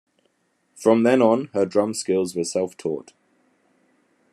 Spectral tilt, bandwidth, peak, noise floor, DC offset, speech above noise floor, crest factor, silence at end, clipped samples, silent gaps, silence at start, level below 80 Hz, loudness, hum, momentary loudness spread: -5 dB/octave; 13 kHz; -2 dBFS; -68 dBFS; under 0.1%; 48 dB; 20 dB; 1.3 s; under 0.1%; none; 0.8 s; -74 dBFS; -21 LUFS; none; 11 LU